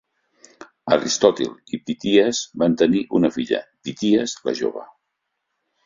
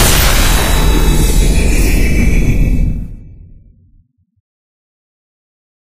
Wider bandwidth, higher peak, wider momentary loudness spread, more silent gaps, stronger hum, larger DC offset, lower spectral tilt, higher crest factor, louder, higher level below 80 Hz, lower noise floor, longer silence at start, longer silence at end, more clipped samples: second, 7.6 kHz vs 15.5 kHz; about the same, -2 dBFS vs 0 dBFS; first, 11 LU vs 7 LU; neither; neither; second, under 0.1% vs 8%; about the same, -4.5 dB/octave vs -4 dB/octave; first, 20 dB vs 12 dB; second, -20 LUFS vs -13 LUFS; second, -60 dBFS vs -14 dBFS; first, -77 dBFS vs -51 dBFS; first, 0.6 s vs 0 s; second, 1 s vs 1.6 s; neither